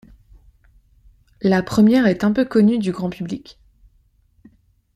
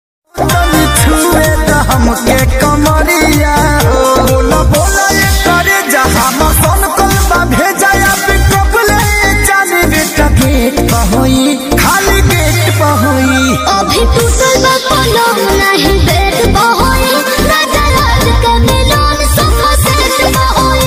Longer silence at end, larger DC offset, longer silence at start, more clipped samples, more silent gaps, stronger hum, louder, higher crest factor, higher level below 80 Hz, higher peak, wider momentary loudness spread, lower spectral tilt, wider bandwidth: first, 1.45 s vs 0 s; neither; first, 1.4 s vs 0.35 s; neither; neither; neither; second, -18 LUFS vs -8 LUFS; first, 16 dB vs 8 dB; second, -50 dBFS vs -16 dBFS; second, -4 dBFS vs 0 dBFS; first, 14 LU vs 2 LU; first, -7 dB/octave vs -4 dB/octave; second, 12.5 kHz vs 16.5 kHz